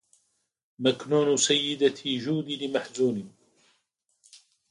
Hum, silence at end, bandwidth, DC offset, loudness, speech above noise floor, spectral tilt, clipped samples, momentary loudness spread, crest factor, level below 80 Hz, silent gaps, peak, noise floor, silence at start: none; 1.4 s; 11.5 kHz; under 0.1%; -26 LUFS; 49 dB; -3.5 dB/octave; under 0.1%; 8 LU; 18 dB; -74 dBFS; none; -10 dBFS; -74 dBFS; 0.8 s